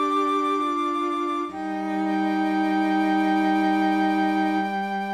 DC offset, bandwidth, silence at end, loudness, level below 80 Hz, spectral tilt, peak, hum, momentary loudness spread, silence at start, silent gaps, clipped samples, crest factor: under 0.1%; 12 kHz; 0 s; -23 LUFS; -68 dBFS; -6 dB/octave; -12 dBFS; none; 6 LU; 0 s; none; under 0.1%; 12 dB